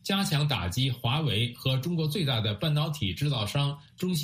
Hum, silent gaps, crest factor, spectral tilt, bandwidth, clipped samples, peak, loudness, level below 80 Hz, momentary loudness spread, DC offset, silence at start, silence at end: none; none; 16 dB; -5.5 dB/octave; 15.5 kHz; under 0.1%; -12 dBFS; -28 LUFS; -54 dBFS; 3 LU; under 0.1%; 0.05 s; 0 s